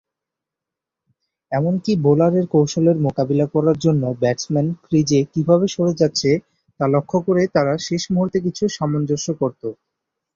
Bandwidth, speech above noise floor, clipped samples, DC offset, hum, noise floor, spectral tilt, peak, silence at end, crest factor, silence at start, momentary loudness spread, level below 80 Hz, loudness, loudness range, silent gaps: 7.6 kHz; 67 dB; under 0.1%; under 0.1%; none; -85 dBFS; -6.5 dB/octave; -2 dBFS; 0.6 s; 16 dB; 1.5 s; 6 LU; -56 dBFS; -19 LUFS; 2 LU; none